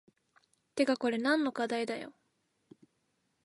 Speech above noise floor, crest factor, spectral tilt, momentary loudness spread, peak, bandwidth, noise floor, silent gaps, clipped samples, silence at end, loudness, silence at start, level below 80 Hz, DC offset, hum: 47 dB; 20 dB; -4 dB/octave; 13 LU; -16 dBFS; 11.5 kHz; -78 dBFS; none; under 0.1%; 1.35 s; -32 LUFS; 0.75 s; -84 dBFS; under 0.1%; none